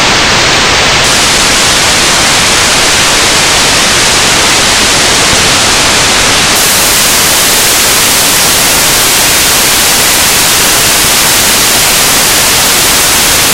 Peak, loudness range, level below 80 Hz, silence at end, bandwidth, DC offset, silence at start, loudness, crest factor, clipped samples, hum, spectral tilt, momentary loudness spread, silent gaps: 0 dBFS; 0 LU; -26 dBFS; 0 s; over 20 kHz; under 0.1%; 0 s; -4 LUFS; 6 dB; 2%; none; -0.5 dB/octave; 0 LU; none